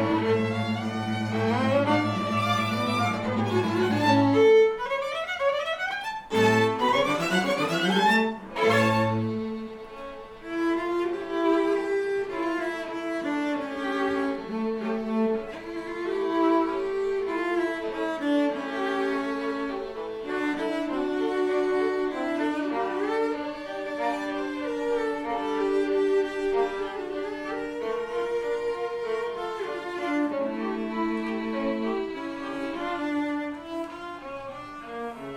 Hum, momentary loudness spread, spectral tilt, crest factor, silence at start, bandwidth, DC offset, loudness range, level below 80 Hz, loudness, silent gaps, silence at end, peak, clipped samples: none; 11 LU; -6 dB/octave; 16 dB; 0 s; 17.5 kHz; under 0.1%; 6 LU; -58 dBFS; -27 LUFS; none; 0 s; -10 dBFS; under 0.1%